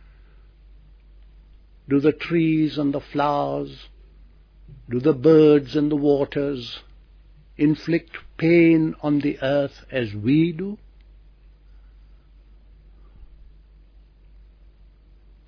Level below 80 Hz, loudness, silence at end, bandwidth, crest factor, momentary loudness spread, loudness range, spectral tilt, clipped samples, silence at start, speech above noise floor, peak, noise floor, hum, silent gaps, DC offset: -48 dBFS; -21 LUFS; 2.2 s; 5.4 kHz; 18 dB; 15 LU; 6 LU; -9 dB/octave; under 0.1%; 1.9 s; 31 dB; -4 dBFS; -50 dBFS; none; none; under 0.1%